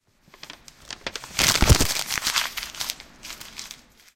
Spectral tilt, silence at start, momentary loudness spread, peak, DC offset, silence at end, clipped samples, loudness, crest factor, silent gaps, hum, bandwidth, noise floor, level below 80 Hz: -2.5 dB/octave; 0.45 s; 24 LU; -2 dBFS; under 0.1%; 0.4 s; under 0.1%; -22 LUFS; 24 dB; none; none; 17 kHz; -48 dBFS; -32 dBFS